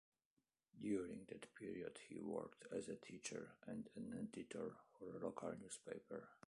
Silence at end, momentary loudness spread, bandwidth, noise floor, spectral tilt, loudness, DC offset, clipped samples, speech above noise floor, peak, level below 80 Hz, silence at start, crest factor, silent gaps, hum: 0.15 s; 8 LU; 11 kHz; under -90 dBFS; -5 dB/octave; -52 LUFS; under 0.1%; under 0.1%; over 39 dB; -32 dBFS; -82 dBFS; 0.75 s; 20 dB; none; none